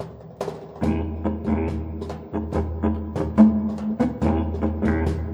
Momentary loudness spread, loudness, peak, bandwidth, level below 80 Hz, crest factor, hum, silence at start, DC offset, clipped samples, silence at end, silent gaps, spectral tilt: 15 LU; -24 LUFS; -2 dBFS; 8 kHz; -34 dBFS; 20 dB; none; 0 s; under 0.1%; under 0.1%; 0 s; none; -9 dB/octave